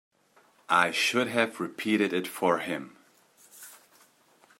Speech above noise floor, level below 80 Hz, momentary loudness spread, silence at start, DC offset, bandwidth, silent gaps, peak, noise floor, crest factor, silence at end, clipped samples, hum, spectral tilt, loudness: 36 dB; -80 dBFS; 23 LU; 0.7 s; under 0.1%; 16 kHz; none; -8 dBFS; -63 dBFS; 24 dB; 0.85 s; under 0.1%; none; -3.5 dB/octave; -27 LUFS